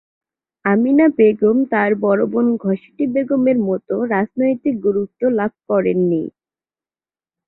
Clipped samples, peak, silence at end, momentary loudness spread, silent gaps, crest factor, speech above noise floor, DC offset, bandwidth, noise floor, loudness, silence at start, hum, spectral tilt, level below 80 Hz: under 0.1%; -2 dBFS; 1.2 s; 8 LU; none; 16 dB; over 74 dB; under 0.1%; 4 kHz; under -90 dBFS; -17 LUFS; 0.65 s; none; -12 dB/octave; -60 dBFS